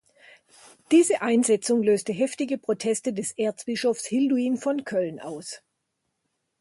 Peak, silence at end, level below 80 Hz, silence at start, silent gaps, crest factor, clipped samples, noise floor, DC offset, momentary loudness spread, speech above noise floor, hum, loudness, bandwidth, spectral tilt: -8 dBFS; 1.05 s; -72 dBFS; 0.9 s; none; 18 dB; under 0.1%; -78 dBFS; under 0.1%; 11 LU; 54 dB; none; -24 LUFS; 11.5 kHz; -4 dB/octave